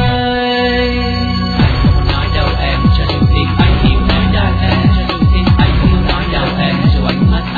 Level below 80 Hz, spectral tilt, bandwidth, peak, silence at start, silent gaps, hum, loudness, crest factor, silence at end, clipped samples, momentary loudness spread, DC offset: -16 dBFS; -8.5 dB/octave; 4.9 kHz; 0 dBFS; 0 s; none; none; -12 LUFS; 12 dB; 0 s; under 0.1%; 4 LU; under 0.1%